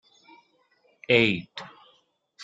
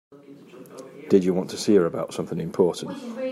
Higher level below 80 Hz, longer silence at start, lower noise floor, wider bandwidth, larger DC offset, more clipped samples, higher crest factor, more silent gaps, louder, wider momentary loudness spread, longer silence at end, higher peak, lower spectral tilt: about the same, -64 dBFS vs -68 dBFS; first, 1.1 s vs 0.1 s; first, -66 dBFS vs -46 dBFS; second, 7.8 kHz vs 12.5 kHz; neither; neither; about the same, 24 dB vs 20 dB; neither; about the same, -23 LUFS vs -24 LUFS; first, 26 LU vs 21 LU; about the same, 0 s vs 0 s; about the same, -6 dBFS vs -4 dBFS; about the same, -6 dB/octave vs -6 dB/octave